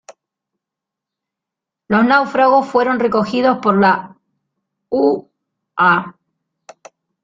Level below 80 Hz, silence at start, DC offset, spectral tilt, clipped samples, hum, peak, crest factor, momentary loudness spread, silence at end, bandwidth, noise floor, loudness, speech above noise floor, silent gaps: -60 dBFS; 0.1 s; under 0.1%; -7 dB/octave; under 0.1%; none; -2 dBFS; 16 dB; 9 LU; 1.15 s; 7.6 kHz; -84 dBFS; -15 LUFS; 70 dB; none